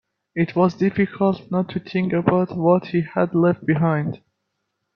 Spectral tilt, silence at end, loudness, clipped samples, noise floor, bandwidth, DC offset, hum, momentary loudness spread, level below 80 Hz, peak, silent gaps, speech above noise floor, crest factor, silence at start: -9.5 dB/octave; 0.8 s; -21 LUFS; under 0.1%; -76 dBFS; 6.2 kHz; under 0.1%; none; 6 LU; -58 dBFS; -2 dBFS; none; 56 dB; 18 dB; 0.35 s